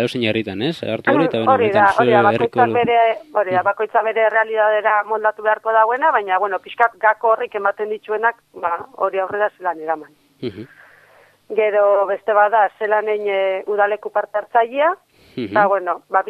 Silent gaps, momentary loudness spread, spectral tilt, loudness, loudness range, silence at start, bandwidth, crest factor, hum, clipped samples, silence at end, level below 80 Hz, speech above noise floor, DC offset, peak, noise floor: none; 9 LU; -6.5 dB/octave; -18 LUFS; 7 LU; 0 s; 11.5 kHz; 18 dB; none; under 0.1%; 0 s; -64 dBFS; 34 dB; under 0.1%; 0 dBFS; -51 dBFS